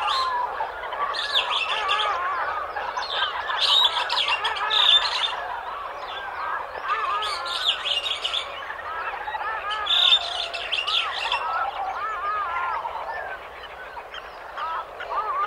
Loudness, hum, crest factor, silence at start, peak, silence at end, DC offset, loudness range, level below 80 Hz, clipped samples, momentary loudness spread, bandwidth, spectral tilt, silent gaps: -23 LUFS; none; 20 dB; 0 s; -6 dBFS; 0 s; under 0.1%; 8 LU; -56 dBFS; under 0.1%; 15 LU; 16 kHz; 0 dB/octave; none